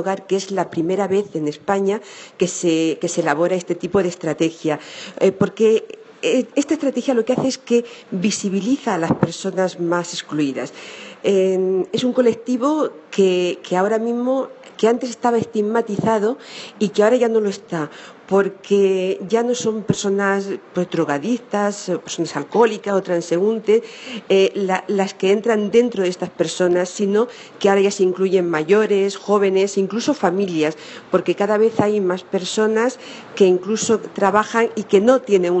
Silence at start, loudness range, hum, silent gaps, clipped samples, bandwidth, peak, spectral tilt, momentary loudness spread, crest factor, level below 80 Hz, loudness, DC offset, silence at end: 0 s; 3 LU; none; none; under 0.1%; 8.6 kHz; 0 dBFS; -5 dB/octave; 8 LU; 18 dB; -62 dBFS; -19 LUFS; under 0.1%; 0 s